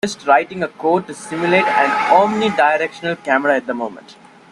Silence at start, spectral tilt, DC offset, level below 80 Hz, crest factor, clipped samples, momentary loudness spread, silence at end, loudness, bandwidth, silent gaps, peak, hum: 0.05 s; -4.5 dB/octave; under 0.1%; -62 dBFS; 16 dB; under 0.1%; 11 LU; 0.4 s; -16 LUFS; 12 kHz; none; 0 dBFS; none